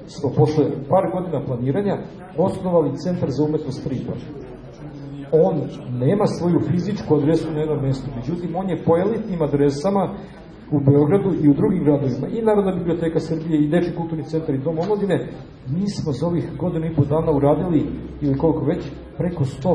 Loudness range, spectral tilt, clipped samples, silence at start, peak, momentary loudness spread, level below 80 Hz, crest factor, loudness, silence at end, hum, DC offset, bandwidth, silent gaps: 4 LU; -9 dB/octave; under 0.1%; 0 s; -4 dBFS; 10 LU; -44 dBFS; 18 dB; -21 LUFS; 0 s; none; under 0.1%; 10.5 kHz; none